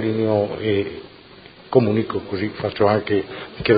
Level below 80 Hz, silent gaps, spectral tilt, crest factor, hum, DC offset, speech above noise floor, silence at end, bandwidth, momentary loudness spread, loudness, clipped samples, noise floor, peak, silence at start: -48 dBFS; none; -11.5 dB/octave; 20 dB; none; under 0.1%; 24 dB; 0 s; 5 kHz; 9 LU; -21 LUFS; under 0.1%; -44 dBFS; -2 dBFS; 0 s